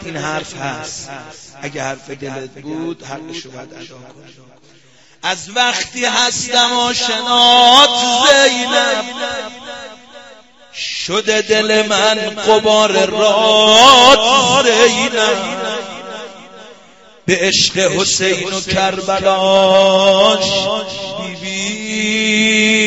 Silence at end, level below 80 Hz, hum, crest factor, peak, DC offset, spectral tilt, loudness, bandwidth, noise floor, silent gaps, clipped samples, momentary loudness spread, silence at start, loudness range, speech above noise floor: 0 s; -50 dBFS; none; 14 dB; 0 dBFS; 0.3%; -2 dB/octave; -11 LUFS; 14.5 kHz; -44 dBFS; none; 0.1%; 20 LU; 0 s; 17 LU; 30 dB